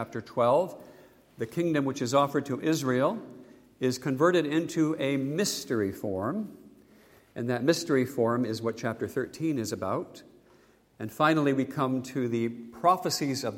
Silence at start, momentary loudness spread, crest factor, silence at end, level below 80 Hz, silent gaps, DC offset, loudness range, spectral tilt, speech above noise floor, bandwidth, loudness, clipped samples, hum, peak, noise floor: 0 s; 11 LU; 20 dB; 0 s; -70 dBFS; none; under 0.1%; 3 LU; -5.5 dB/octave; 33 dB; 16.5 kHz; -28 LUFS; under 0.1%; none; -10 dBFS; -61 dBFS